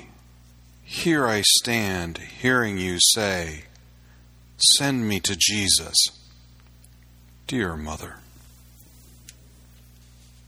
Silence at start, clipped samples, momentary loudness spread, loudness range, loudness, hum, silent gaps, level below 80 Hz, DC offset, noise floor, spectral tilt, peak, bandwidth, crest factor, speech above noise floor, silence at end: 0 s; under 0.1%; 17 LU; 14 LU; -20 LUFS; 60 Hz at -50 dBFS; none; -48 dBFS; under 0.1%; -51 dBFS; -2 dB/octave; -2 dBFS; over 20 kHz; 24 dB; 28 dB; 2.3 s